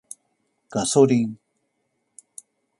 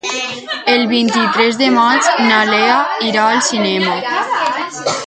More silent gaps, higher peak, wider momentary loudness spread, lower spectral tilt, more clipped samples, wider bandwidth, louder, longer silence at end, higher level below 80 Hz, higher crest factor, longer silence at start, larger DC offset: neither; second, -4 dBFS vs 0 dBFS; first, 26 LU vs 8 LU; first, -5 dB/octave vs -2.5 dB/octave; neither; first, 11.5 kHz vs 9.4 kHz; second, -21 LUFS vs -13 LUFS; first, 1.45 s vs 0 s; about the same, -64 dBFS vs -62 dBFS; first, 22 dB vs 14 dB; first, 0.7 s vs 0.05 s; neither